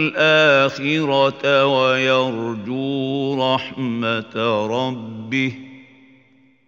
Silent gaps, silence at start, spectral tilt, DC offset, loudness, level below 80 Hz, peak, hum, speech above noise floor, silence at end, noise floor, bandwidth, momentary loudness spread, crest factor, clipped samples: none; 0 s; -5.5 dB/octave; under 0.1%; -18 LUFS; -66 dBFS; -2 dBFS; none; 36 dB; 0.85 s; -55 dBFS; 7.4 kHz; 11 LU; 18 dB; under 0.1%